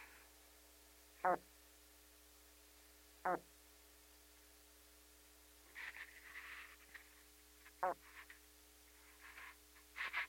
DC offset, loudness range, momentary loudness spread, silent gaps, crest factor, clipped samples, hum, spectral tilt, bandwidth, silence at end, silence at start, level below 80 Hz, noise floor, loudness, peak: under 0.1%; 9 LU; 20 LU; none; 28 dB; under 0.1%; none; -3 dB/octave; 16.5 kHz; 0 s; 0 s; -74 dBFS; -66 dBFS; -47 LUFS; -22 dBFS